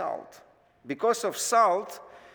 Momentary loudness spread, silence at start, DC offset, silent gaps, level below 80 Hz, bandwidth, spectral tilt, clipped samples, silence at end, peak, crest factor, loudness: 18 LU; 0 s; under 0.1%; none; -76 dBFS; over 20 kHz; -2 dB/octave; under 0.1%; 0.15 s; -10 dBFS; 18 dB; -26 LUFS